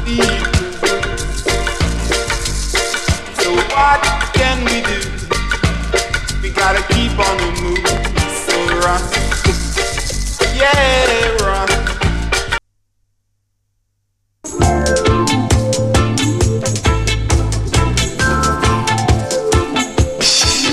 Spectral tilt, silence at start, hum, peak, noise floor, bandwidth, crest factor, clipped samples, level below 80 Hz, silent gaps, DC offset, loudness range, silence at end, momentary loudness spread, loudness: -4 dB/octave; 0 s; none; 0 dBFS; -66 dBFS; 14.5 kHz; 14 dB; under 0.1%; -22 dBFS; none; under 0.1%; 3 LU; 0 s; 6 LU; -15 LUFS